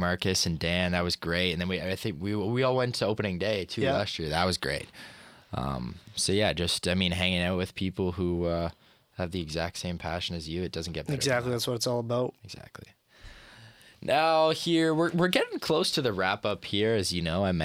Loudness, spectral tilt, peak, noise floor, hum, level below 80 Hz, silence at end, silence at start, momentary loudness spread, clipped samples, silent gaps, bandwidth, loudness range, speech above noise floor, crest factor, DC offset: -28 LUFS; -4.5 dB/octave; -6 dBFS; -53 dBFS; none; -54 dBFS; 0 s; 0 s; 10 LU; under 0.1%; none; 16 kHz; 5 LU; 24 dB; 22 dB; under 0.1%